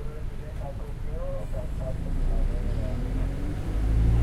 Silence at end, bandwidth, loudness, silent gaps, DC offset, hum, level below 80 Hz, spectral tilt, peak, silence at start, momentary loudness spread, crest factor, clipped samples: 0 s; 12 kHz; -32 LUFS; none; under 0.1%; none; -28 dBFS; -8 dB/octave; -12 dBFS; 0 s; 9 LU; 14 dB; under 0.1%